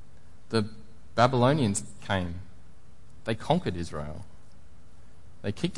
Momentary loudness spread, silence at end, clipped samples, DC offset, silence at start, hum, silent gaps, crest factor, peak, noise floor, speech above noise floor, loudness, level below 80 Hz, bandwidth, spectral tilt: 15 LU; 0 s; under 0.1%; 1%; 0.5 s; none; none; 24 dB; -8 dBFS; -55 dBFS; 28 dB; -29 LUFS; -54 dBFS; 11.5 kHz; -5.5 dB/octave